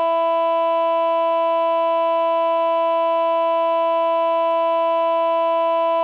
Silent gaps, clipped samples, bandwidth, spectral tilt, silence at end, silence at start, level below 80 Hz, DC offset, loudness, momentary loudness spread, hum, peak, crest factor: none; under 0.1%; 4.9 kHz; -3 dB/octave; 0 s; 0 s; -90 dBFS; under 0.1%; -19 LUFS; 0 LU; none; -12 dBFS; 6 dB